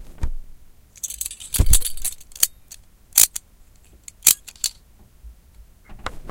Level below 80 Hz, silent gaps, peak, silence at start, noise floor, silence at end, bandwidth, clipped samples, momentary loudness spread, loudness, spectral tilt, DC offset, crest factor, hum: -30 dBFS; none; 0 dBFS; 0 s; -50 dBFS; 0 s; 17 kHz; under 0.1%; 19 LU; -19 LUFS; -1 dB/octave; under 0.1%; 22 dB; none